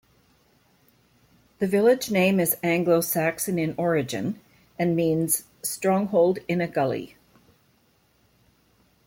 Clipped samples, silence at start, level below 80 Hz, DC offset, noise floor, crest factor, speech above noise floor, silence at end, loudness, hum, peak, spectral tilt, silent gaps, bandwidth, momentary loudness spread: under 0.1%; 1.6 s; -64 dBFS; under 0.1%; -64 dBFS; 16 dB; 41 dB; 2 s; -24 LUFS; none; -8 dBFS; -5 dB/octave; none; 16.5 kHz; 10 LU